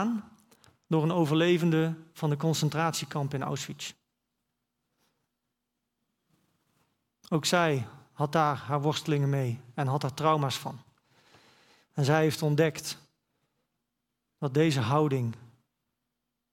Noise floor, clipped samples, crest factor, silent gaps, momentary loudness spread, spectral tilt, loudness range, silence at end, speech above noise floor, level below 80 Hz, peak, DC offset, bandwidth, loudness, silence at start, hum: -84 dBFS; under 0.1%; 22 dB; none; 12 LU; -5.5 dB/octave; 7 LU; 1.05 s; 56 dB; -72 dBFS; -10 dBFS; under 0.1%; 16 kHz; -28 LUFS; 0 s; none